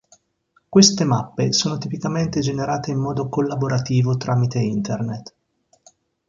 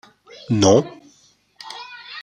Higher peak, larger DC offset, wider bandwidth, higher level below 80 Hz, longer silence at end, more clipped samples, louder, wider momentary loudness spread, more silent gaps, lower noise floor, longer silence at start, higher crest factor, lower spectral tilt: about the same, 0 dBFS vs -2 dBFS; neither; second, 7.6 kHz vs 9.8 kHz; first, -54 dBFS vs -60 dBFS; first, 1.05 s vs 0 s; neither; second, -20 LUFS vs -17 LUFS; second, 11 LU vs 21 LU; neither; first, -64 dBFS vs -57 dBFS; first, 0.7 s vs 0.5 s; about the same, 20 dB vs 20 dB; about the same, -5 dB/octave vs -5 dB/octave